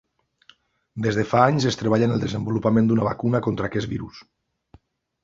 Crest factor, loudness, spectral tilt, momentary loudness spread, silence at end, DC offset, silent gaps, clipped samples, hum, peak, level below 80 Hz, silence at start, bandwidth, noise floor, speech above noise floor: 22 dB; -22 LUFS; -7 dB/octave; 11 LU; 1 s; under 0.1%; none; under 0.1%; none; -2 dBFS; -52 dBFS; 0.95 s; 7.6 kHz; -57 dBFS; 36 dB